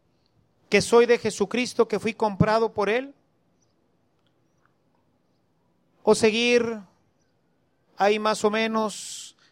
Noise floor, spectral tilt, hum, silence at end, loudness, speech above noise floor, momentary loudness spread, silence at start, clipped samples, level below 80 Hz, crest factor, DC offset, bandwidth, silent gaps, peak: -69 dBFS; -4.5 dB/octave; none; 0.25 s; -23 LUFS; 47 dB; 12 LU; 0.7 s; under 0.1%; -56 dBFS; 20 dB; under 0.1%; 13.5 kHz; none; -6 dBFS